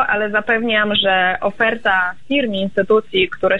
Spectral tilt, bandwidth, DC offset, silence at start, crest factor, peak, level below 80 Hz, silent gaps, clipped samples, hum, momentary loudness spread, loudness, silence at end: -6 dB/octave; 7.8 kHz; 2%; 0 s; 14 dB; -4 dBFS; -50 dBFS; none; under 0.1%; none; 4 LU; -16 LUFS; 0 s